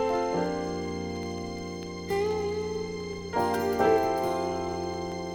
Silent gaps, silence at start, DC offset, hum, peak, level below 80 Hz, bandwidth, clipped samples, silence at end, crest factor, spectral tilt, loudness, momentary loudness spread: none; 0 s; under 0.1%; none; -12 dBFS; -58 dBFS; over 20 kHz; under 0.1%; 0 s; 18 dB; -5.5 dB/octave; -30 LUFS; 11 LU